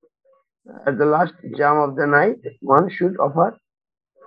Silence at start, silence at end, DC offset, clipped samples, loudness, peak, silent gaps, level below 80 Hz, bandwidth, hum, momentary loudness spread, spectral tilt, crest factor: 0.7 s; 0.75 s; under 0.1%; under 0.1%; -19 LUFS; 0 dBFS; none; -70 dBFS; 5.2 kHz; none; 7 LU; -10 dB/octave; 20 dB